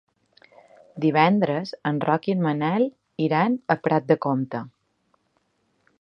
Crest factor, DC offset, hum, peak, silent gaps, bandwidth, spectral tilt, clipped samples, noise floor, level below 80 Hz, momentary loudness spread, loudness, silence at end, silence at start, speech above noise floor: 22 dB; under 0.1%; none; -2 dBFS; none; 6.2 kHz; -8.5 dB/octave; under 0.1%; -70 dBFS; -72 dBFS; 8 LU; -23 LUFS; 1.35 s; 0.95 s; 48 dB